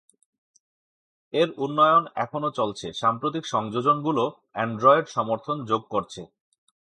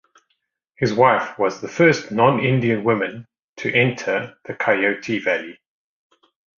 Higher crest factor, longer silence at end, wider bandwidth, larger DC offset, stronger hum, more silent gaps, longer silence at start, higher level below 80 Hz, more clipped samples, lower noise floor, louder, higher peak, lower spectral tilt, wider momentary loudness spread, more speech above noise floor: about the same, 22 dB vs 20 dB; second, 0.65 s vs 1.05 s; first, 11 kHz vs 7.2 kHz; neither; neither; second, none vs 3.39-3.56 s; first, 1.35 s vs 0.8 s; second, -68 dBFS vs -58 dBFS; neither; first, under -90 dBFS vs -72 dBFS; second, -24 LUFS vs -19 LUFS; about the same, -4 dBFS vs -2 dBFS; about the same, -5.5 dB/octave vs -6 dB/octave; about the same, 11 LU vs 9 LU; first, over 66 dB vs 53 dB